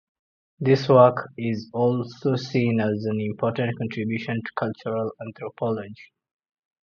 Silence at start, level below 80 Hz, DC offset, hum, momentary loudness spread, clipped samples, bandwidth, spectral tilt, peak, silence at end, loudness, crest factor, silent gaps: 0.6 s; -64 dBFS; under 0.1%; none; 12 LU; under 0.1%; 7 kHz; -8 dB/octave; -2 dBFS; 0.8 s; -24 LUFS; 22 dB; none